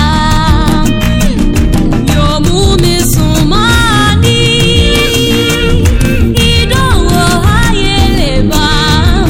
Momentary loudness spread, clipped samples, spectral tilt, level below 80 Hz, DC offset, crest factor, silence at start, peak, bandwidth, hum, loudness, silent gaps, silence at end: 3 LU; 0.5%; -5 dB/octave; -14 dBFS; under 0.1%; 8 dB; 0 s; 0 dBFS; 17 kHz; none; -9 LUFS; none; 0 s